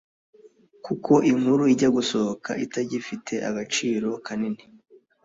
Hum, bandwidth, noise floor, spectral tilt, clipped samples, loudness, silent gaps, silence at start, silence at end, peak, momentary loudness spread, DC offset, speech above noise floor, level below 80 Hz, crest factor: none; 8 kHz; -54 dBFS; -5 dB/octave; under 0.1%; -24 LUFS; none; 0.45 s; 0.7 s; -6 dBFS; 12 LU; under 0.1%; 31 dB; -64 dBFS; 20 dB